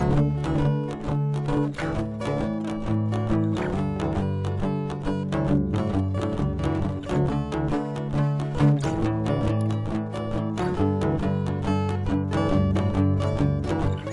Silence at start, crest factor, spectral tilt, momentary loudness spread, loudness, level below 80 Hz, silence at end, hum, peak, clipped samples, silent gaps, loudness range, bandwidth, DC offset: 0 s; 16 dB; -8.5 dB/octave; 5 LU; -25 LUFS; -38 dBFS; 0 s; none; -8 dBFS; under 0.1%; none; 2 LU; 11 kHz; under 0.1%